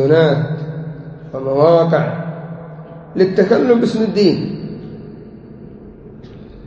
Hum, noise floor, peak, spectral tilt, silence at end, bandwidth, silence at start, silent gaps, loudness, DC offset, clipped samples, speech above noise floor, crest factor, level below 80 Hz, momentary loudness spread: none; -36 dBFS; 0 dBFS; -8 dB/octave; 0 s; 8 kHz; 0 s; none; -15 LUFS; under 0.1%; under 0.1%; 23 dB; 16 dB; -48 dBFS; 25 LU